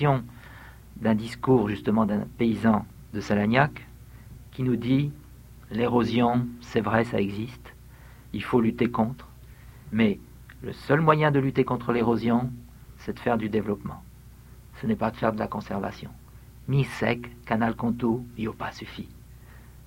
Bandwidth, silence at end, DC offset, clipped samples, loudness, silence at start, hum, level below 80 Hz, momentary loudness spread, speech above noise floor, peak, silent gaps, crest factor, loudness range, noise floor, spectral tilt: 16.5 kHz; 0.15 s; under 0.1%; under 0.1%; -26 LUFS; 0 s; none; -50 dBFS; 19 LU; 23 dB; -4 dBFS; none; 24 dB; 5 LU; -48 dBFS; -8 dB/octave